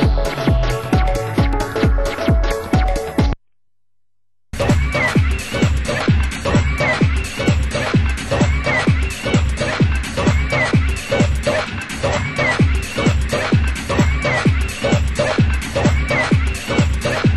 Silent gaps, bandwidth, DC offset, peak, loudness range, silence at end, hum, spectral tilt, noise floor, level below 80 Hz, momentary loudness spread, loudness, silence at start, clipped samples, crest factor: none; 12.5 kHz; 0.2%; -4 dBFS; 3 LU; 0 s; none; -6 dB/octave; -79 dBFS; -22 dBFS; 3 LU; -18 LUFS; 0 s; under 0.1%; 14 dB